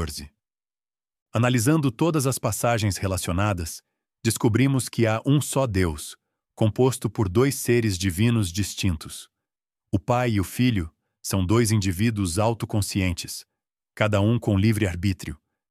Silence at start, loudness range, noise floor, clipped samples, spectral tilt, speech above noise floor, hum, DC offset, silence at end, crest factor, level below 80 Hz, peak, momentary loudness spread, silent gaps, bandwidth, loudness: 0 s; 2 LU; under -90 dBFS; under 0.1%; -5.5 dB/octave; over 67 dB; none; under 0.1%; 0.35 s; 20 dB; -46 dBFS; -2 dBFS; 12 LU; 1.22-1.26 s; 15.5 kHz; -24 LUFS